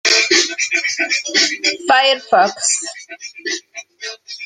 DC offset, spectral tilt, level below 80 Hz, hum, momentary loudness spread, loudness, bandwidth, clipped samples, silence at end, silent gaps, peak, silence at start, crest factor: under 0.1%; 0.5 dB/octave; -68 dBFS; none; 17 LU; -15 LUFS; 12.5 kHz; under 0.1%; 0 s; none; 0 dBFS; 0.05 s; 18 dB